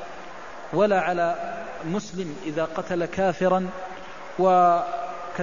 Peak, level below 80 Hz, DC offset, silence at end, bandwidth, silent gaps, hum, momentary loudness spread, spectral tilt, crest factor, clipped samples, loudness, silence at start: -8 dBFS; -58 dBFS; 0.8%; 0 s; 7.4 kHz; none; none; 18 LU; -6 dB/octave; 16 dB; under 0.1%; -24 LUFS; 0 s